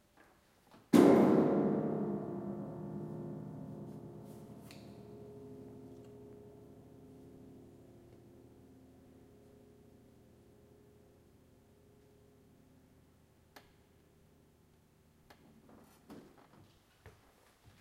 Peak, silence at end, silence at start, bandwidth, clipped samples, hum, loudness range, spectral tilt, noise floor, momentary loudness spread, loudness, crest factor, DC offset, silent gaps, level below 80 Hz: -12 dBFS; 0.7 s; 0.95 s; 16 kHz; under 0.1%; none; 30 LU; -7.5 dB/octave; -67 dBFS; 30 LU; -32 LUFS; 28 dB; under 0.1%; none; -74 dBFS